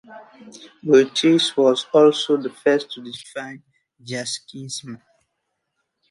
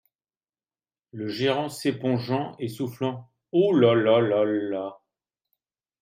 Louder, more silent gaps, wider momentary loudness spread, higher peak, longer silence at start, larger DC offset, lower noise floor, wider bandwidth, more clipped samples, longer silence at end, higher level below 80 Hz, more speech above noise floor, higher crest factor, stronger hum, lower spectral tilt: first, -18 LUFS vs -24 LUFS; neither; first, 18 LU vs 14 LU; first, -2 dBFS vs -6 dBFS; second, 0.1 s vs 1.15 s; neither; second, -76 dBFS vs under -90 dBFS; second, 11.5 kHz vs 16 kHz; neither; about the same, 1.15 s vs 1.05 s; about the same, -72 dBFS vs -72 dBFS; second, 56 dB vs over 66 dB; about the same, 18 dB vs 20 dB; neither; second, -4 dB/octave vs -6.5 dB/octave